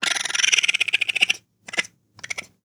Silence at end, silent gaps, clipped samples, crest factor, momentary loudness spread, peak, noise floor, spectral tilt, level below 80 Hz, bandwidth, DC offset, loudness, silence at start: 0.2 s; none; under 0.1%; 24 dB; 15 LU; 0 dBFS; -41 dBFS; 2 dB/octave; -74 dBFS; over 20 kHz; under 0.1%; -20 LUFS; 0 s